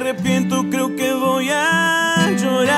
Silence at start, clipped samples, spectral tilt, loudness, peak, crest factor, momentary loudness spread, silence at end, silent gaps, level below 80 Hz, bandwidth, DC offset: 0 s; under 0.1%; -4 dB/octave; -17 LUFS; -2 dBFS; 14 dB; 4 LU; 0 s; none; -58 dBFS; 16 kHz; under 0.1%